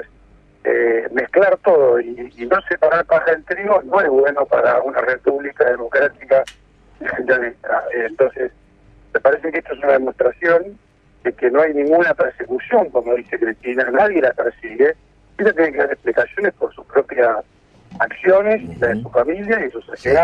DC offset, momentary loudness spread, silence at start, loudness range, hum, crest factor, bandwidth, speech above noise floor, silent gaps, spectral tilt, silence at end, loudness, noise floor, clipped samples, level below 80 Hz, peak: under 0.1%; 9 LU; 0 s; 3 LU; none; 16 dB; 7.2 kHz; 33 dB; none; -7 dB/octave; 0 s; -17 LUFS; -49 dBFS; under 0.1%; -50 dBFS; -2 dBFS